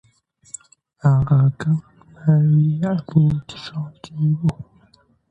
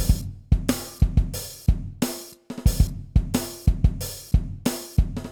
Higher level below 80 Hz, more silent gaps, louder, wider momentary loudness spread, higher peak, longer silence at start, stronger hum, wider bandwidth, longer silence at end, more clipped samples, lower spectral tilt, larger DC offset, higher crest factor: second, -48 dBFS vs -26 dBFS; neither; first, -19 LUFS vs -25 LUFS; first, 21 LU vs 6 LU; about the same, -4 dBFS vs -6 dBFS; first, 1.05 s vs 0 s; neither; second, 8.8 kHz vs over 20 kHz; first, 0.65 s vs 0 s; neither; first, -8 dB/octave vs -5.5 dB/octave; neither; about the same, 16 dB vs 18 dB